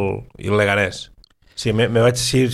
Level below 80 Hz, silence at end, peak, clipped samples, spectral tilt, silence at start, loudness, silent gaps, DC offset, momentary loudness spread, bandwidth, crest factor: -46 dBFS; 0 s; -2 dBFS; under 0.1%; -5 dB/octave; 0 s; -18 LUFS; none; under 0.1%; 18 LU; 14.5 kHz; 16 dB